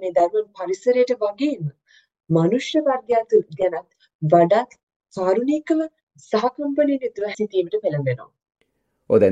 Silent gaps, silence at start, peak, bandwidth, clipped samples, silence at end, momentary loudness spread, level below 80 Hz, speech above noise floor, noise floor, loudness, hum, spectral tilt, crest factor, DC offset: 4.15-4.19 s, 4.83-4.87 s, 4.96-5.00 s, 6.03-6.07 s; 0 s; -2 dBFS; 8.2 kHz; under 0.1%; 0 s; 10 LU; -66 dBFS; 49 dB; -69 dBFS; -21 LUFS; none; -7 dB/octave; 18 dB; under 0.1%